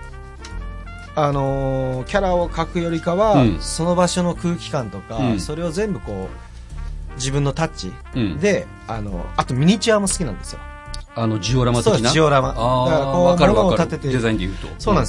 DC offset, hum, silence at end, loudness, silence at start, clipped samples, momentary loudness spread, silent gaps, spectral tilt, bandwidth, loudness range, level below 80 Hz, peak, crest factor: under 0.1%; none; 0 s; -19 LUFS; 0 s; under 0.1%; 18 LU; none; -5.5 dB/octave; 11.5 kHz; 8 LU; -32 dBFS; 0 dBFS; 18 dB